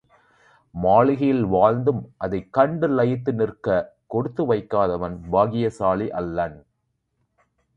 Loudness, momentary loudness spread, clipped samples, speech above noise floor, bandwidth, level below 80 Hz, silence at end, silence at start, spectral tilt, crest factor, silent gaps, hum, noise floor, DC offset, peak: -22 LUFS; 10 LU; under 0.1%; 53 dB; 9.6 kHz; -50 dBFS; 1.2 s; 0.75 s; -9 dB/octave; 20 dB; none; none; -74 dBFS; under 0.1%; -2 dBFS